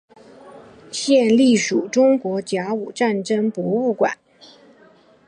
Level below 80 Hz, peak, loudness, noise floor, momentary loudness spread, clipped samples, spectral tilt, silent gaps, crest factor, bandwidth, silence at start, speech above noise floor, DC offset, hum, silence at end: -68 dBFS; -4 dBFS; -19 LUFS; -51 dBFS; 10 LU; under 0.1%; -4.5 dB/octave; none; 16 dB; 10.5 kHz; 0.45 s; 33 dB; under 0.1%; none; 1.15 s